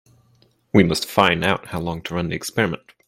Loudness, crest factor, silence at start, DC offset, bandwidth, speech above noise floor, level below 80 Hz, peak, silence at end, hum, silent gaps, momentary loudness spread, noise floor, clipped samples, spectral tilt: -20 LUFS; 22 dB; 0.75 s; under 0.1%; 16.5 kHz; 39 dB; -50 dBFS; 0 dBFS; 0.3 s; none; none; 9 LU; -59 dBFS; under 0.1%; -5 dB/octave